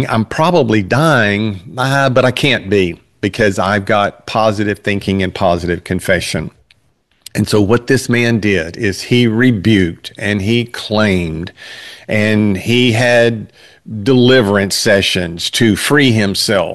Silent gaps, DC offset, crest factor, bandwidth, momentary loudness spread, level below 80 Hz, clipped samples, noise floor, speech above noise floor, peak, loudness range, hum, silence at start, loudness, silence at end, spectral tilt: none; 0.6%; 12 dB; 12.5 kHz; 9 LU; -44 dBFS; under 0.1%; -58 dBFS; 45 dB; 0 dBFS; 4 LU; none; 0 s; -13 LUFS; 0 s; -5 dB/octave